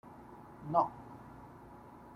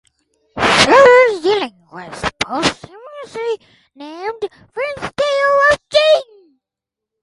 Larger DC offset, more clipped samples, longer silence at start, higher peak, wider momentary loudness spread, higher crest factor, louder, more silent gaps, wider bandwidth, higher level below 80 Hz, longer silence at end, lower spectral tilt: neither; neither; second, 0.05 s vs 0.55 s; second, -14 dBFS vs 0 dBFS; second, 21 LU vs 24 LU; first, 26 dB vs 16 dB; second, -34 LUFS vs -14 LUFS; neither; first, 14.5 kHz vs 11.5 kHz; second, -66 dBFS vs -48 dBFS; second, 0 s vs 1 s; first, -8.5 dB/octave vs -3 dB/octave